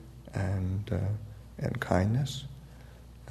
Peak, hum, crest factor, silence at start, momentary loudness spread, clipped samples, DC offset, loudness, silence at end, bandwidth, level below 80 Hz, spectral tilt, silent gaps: -10 dBFS; none; 24 dB; 0 s; 22 LU; under 0.1%; under 0.1%; -32 LUFS; 0 s; 13.5 kHz; -50 dBFS; -7 dB/octave; none